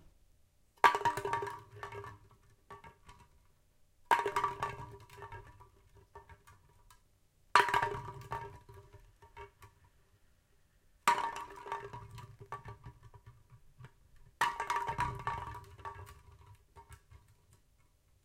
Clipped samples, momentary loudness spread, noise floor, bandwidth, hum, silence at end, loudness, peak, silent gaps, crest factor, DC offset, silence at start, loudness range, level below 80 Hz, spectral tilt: under 0.1%; 27 LU; -69 dBFS; 16 kHz; none; 1.05 s; -35 LUFS; -6 dBFS; none; 34 dB; under 0.1%; 0.85 s; 7 LU; -62 dBFS; -3 dB/octave